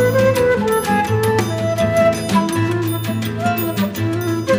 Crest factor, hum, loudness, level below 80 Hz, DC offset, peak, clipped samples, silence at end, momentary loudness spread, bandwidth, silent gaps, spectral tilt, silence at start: 14 dB; none; -17 LUFS; -44 dBFS; under 0.1%; -2 dBFS; under 0.1%; 0 s; 6 LU; 15.5 kHz; none; -6 dB/octave; 0 s